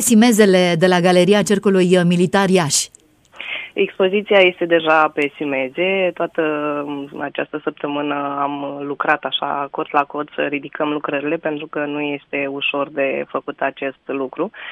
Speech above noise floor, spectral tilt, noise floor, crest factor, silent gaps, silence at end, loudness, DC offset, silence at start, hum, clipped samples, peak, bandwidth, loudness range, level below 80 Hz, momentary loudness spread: 20 dB; -4.5 dB/octave; -37 dBFS; 18 dB; none; 0 s; -18 LUFS; under 0.1%; 0 s; none; under 0.1%; 0 dBFS; 15.5 kHz; 7 LU; -62 dBFS; 12 LU